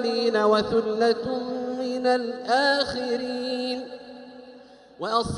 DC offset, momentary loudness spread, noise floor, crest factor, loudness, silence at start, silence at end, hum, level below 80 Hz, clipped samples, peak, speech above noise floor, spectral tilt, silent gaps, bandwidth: under 0.1%; 16 LU; -48 dBFS; 16 dB; -25 LUFS; 0 s; 0 s; none; -56 dBFS; under 0.1%; -8 dBFS; 24 dB; -4.5 dB/octave; none; 11.5 kHz